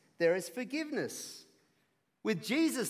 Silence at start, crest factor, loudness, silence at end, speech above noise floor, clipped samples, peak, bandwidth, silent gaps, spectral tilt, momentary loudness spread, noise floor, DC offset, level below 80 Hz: 0.2 s; 18 dB; -35 LUFS; 0 s; 43 dB; under 0.1%; -18 dBFS; 16 kHz; none; -4 dB/octave; 13 LU; -77 dBFS; under 0.1%; -88 dBFS